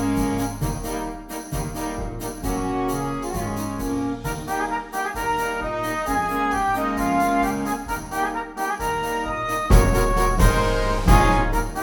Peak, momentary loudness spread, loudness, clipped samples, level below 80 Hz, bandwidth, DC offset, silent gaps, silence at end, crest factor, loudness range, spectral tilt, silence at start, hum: -2 dBFS; 10 LU; -23 LUFS; under 0.1%; -26 dBFS; 19.5 kHz; under 0.1%; none; 0 s; 20 dB; 7 LU; -5.5 dB/octave; 0 s; none